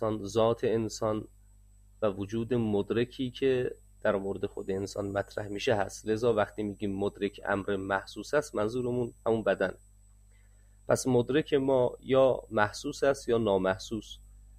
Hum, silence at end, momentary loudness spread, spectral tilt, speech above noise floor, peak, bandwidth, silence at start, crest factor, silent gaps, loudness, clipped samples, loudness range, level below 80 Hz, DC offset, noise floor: 50 Hz at -55 dBFS; 0.2 s; 8 LU; -5.5 dB/octave; 28 dB; -10 dBFS; 15.5 kHz; 0 s; 20 dB; none; -30 LUFS; under 0.1%; 4 LU; -54 dBFS; under 0.1%; -58 dBFS